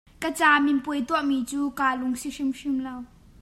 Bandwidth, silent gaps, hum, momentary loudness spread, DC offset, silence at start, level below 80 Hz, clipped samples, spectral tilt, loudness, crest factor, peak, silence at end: 13.5 kHz; none; none; 11 LU; under 0.1%; 0.2 s; -56 dBFS; under 0.1%; -3 dB/octave; -25 LUFS; 20 dB; -6 dBFS; 0.35 s